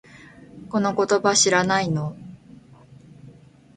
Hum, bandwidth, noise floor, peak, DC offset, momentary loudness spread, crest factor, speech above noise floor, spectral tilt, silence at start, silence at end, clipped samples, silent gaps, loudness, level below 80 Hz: none; 9.6 kHz; -49 dBFS; -6 dBFS; under 0.1%; 18 LU; 20 dB; 28 dB; -3.5 dB/octave; 0.55 s; 0.45 s; under 0.1%; none; -20 LUFS; -60 dBFS